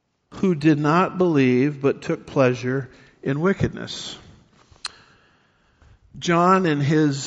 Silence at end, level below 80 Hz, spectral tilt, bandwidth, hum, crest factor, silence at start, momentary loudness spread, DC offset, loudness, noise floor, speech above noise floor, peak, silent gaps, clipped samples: 0 s; -52 dBFS; -6 dB/octave; 8 kHz; none; 18 dB; 0.3 s; 17 LU; under 0.1%; -21 LUFS; -61 dBFS; 41 dB; -4 dBFS; none; under 0.1%